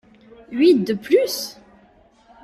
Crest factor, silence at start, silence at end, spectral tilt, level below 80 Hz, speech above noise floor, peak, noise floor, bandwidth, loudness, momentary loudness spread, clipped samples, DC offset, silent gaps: 16 dB; 0.5 s; 0.9 s; -5 dB/octave; -62 dBFS; 36 dB; -4 dBFS; -54 dBFS; 15.5 kHz; -18 LUFS; 15 LU; under 0.1%; under 0.1%; none